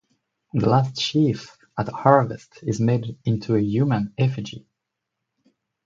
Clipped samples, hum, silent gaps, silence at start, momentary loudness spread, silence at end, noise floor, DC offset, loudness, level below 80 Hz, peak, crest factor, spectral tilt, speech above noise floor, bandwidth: under 0.1%; none; none; 0.55 s; 14 LU; 1.25 s; -82 dBFS; under 0.1%; -22 LUFS; -56 dBFS; 0 dBFS; 22 dB; -7 dB/octave; 61 dB; 7.6 kHz